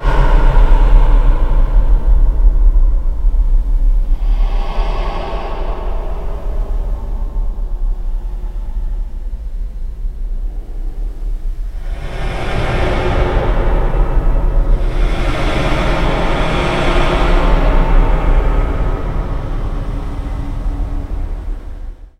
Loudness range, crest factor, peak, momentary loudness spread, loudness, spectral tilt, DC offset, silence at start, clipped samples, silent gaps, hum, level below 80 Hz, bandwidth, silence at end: 10 LU; 12 dB; 0 dBFS; 12 LU; -19 LUFS; -7 dB/octave; under 0.1%; 0 s; under 0.1%; none; none; -14 dBFS; 6 kHz; 0.1 s